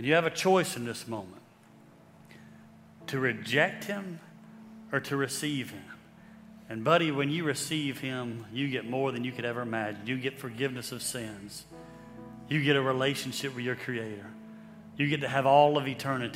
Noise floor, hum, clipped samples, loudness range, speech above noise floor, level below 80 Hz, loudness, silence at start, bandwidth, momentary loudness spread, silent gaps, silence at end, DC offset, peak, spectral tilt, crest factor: -56 dBFS; none; under 0.1%; 5 LU; 26 dB; -70 dBFS; -30 LUFS; 0 s; 16 kHz; 22 LU; none; 0 s; under 0.1%; -8 dBFS; -4.5 dB/octave; 22 dB